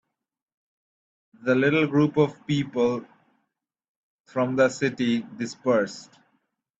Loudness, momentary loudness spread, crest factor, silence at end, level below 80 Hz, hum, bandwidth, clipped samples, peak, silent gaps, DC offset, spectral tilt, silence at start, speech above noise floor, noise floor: -24 LUFS; 11 LU; 20 dB; 0.75 s; -66 dBFS; none; 8 kHz; under 0.1%; -6 dBFS; 3.88-4.25 s; under 0.1%; -6 dB/octave; 1.45 s; 56 dB; -80 dBFS